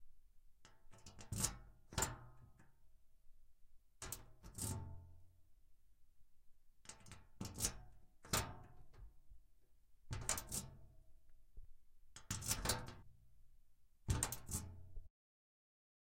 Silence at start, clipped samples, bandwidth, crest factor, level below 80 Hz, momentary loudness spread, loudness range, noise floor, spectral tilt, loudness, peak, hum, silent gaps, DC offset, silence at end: 0 s; under 0.1%; 16.5 kHz; 32 dB; -58 dBFS; 22 LU; 8 LU; -70 dBFS; -2.5 dB/octave; -44 LUFS; -18 dBFS; none; none; under 0.1%; 1 s